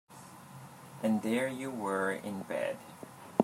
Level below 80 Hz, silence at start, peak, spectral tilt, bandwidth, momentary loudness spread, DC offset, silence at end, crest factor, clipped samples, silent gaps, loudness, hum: -82 dBFS; 0.1 s; -8 dBFS; -5.5 dB/octave; 16 kHz; 19 LU; under 0.1%; 0 s; 28 dB; under 0.1%; none; -34 LUFS; none